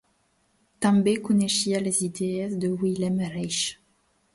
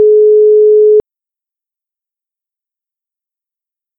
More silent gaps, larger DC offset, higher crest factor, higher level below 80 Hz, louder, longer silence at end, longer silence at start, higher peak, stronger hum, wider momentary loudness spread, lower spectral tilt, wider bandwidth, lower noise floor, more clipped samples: neither; neither; first, 16 dB vs 10 dB; about the same, -62 dBFS vs -58 dBFS; second, -25 LUFS vs -7 LUFS; second, 0.6 s vs 3 s; first, 0.8 s vs 0 s; second, -10 dBFS vs -2 dBFS; neither; first, 6 LU vs 3 LU; second, -4.5 dB/octave vs -11 dB/octave; first, 11.5 kHz vs 1 kHz; second, -68 dBFS vs -87 dBFS; neither